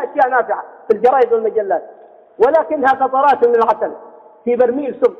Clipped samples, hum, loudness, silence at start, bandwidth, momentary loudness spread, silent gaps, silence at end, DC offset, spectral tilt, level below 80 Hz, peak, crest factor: under 0.1%; none; -15 LUFS; 0 s; 6 kHz; 10 LU; none; 0.05 s; under 0.1%; -6.5 dB/octave; -60 dBFS; -2 dBFS; 14 dB